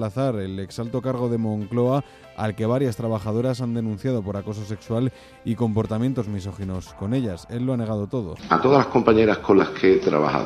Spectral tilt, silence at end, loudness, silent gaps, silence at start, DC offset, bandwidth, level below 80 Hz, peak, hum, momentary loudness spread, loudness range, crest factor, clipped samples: -7.5 dB/octave; 0 s; -23 LUFS; none; 0 s; under 0.1%; 14 kHz; -50 dBFS; 0 dBFS; none; 13 LU; 6 LU; 22 dB; under 0.1%